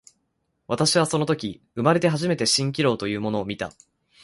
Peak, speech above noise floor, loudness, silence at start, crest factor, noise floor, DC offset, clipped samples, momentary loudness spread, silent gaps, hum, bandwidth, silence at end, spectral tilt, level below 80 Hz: -4 dBFS; 51 dB; -23 LUFS; 0.7 s; 20 dB; -74 dBFS; under 0.1%; under 0.1%; 11 LU; none; none; 11.5 kHz; 0.55 s; -4.5 dB/octave; -58 dBFS